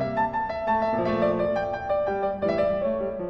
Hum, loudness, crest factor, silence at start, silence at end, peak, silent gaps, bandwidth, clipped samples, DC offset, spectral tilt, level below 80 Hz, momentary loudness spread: none; -25 LUFS; 14 dB; 0 s; 0 s; -12 dBFS; none; 6.6 kHz; under 0.1%; under 0.1%; -8 dB/octave; -50 dBFS; 3 LU